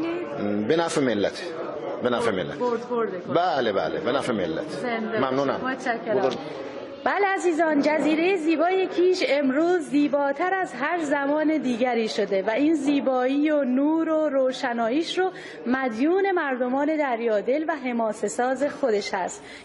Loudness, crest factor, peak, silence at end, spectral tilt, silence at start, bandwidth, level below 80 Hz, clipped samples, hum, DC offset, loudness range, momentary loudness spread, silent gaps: -24 LUFS; 16 dB; -8 dBFS; 0 s; -5 dB/octave; 0 s; 11.5 kHz; -68 dBFS; under 0.1%; none; under 0.1%; 3 LU; 6 LU; none